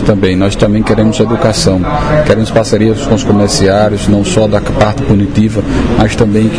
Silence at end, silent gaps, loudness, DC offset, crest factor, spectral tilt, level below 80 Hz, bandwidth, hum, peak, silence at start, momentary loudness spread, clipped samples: 0 s; none; -10 LUFS; 3%; 10 dB; -6 dB/octave; -24 dBFS; 10.5 kHz; none; 0 dBFS; 0 s; 3 LU; 0.7%